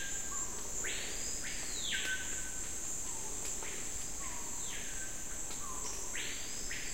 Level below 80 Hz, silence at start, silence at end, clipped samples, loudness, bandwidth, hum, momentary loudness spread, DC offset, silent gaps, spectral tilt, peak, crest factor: -52 dBFS; 0 s; 0 s; under 0.1%; -38 LUFS; 16 kHz; none; 4 LU; 0.8%; none; -0.5 dB/octave; -22 dBFS; 16 dB